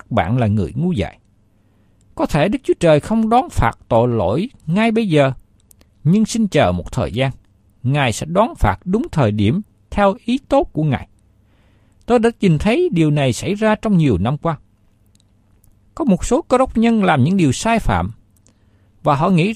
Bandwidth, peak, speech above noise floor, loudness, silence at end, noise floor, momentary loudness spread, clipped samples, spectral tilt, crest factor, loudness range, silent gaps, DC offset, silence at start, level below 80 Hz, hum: 14 kHz; -2 dBFS; 39 dB; -17 LUFS; 0 s; -55 dBFS; 8 LU; under 0.1%; -6.5 dB/octave; 16 dB; 2 LU; none; under 0.1%; 0.1 s; -34 dBFS; none